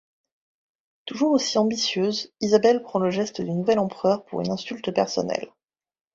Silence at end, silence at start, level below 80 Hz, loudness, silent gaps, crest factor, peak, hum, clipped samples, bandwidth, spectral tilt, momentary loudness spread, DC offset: 0.65 s; 1.05 s; -64 dBFS; -23 LUFS; none; 20 dB; -4 dBFS; none; under 0.1%; 7.8 kHz; -5 dB/octave; 9 LU; under 0.1%